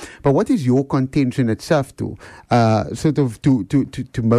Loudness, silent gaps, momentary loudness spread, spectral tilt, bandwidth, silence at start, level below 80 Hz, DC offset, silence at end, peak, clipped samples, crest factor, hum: -18 LUFS; none; 9 LU; -7.5 dB/octave; 13 kHz; 0 s; -46 dBFS; under 0.1%; 0 s; -6 dBFS; under 0.1%; 12 dB; none